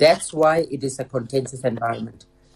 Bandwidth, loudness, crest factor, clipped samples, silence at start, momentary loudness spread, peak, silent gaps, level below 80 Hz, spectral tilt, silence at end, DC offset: 13 kHz; -22 LUFS; 16 dB; under 0.1%; 0 s; 10 LU; -4 dBFS; none; -56 dBFS; -4.5 dB/octave; 0.45 s; under 0.1%